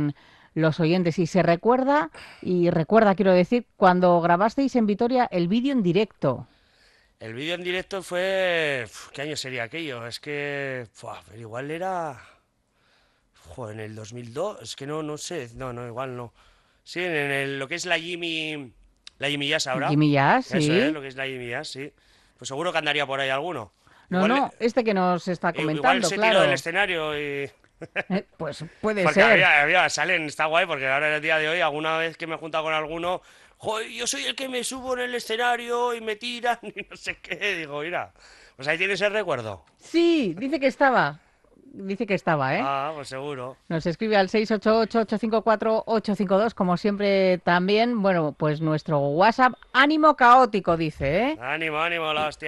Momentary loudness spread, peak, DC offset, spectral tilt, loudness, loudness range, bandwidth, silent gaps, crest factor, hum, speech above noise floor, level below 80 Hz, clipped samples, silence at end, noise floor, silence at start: 15 LU; -4 dBFS; under 0.1%; -5 dB/octave; -23 LUFS; 12 LU; 12.5 kHz; none; 20 dB; none; 44 dB; -58 dBFS; under 0.1%; 0 s; -67 dBFS; 0 s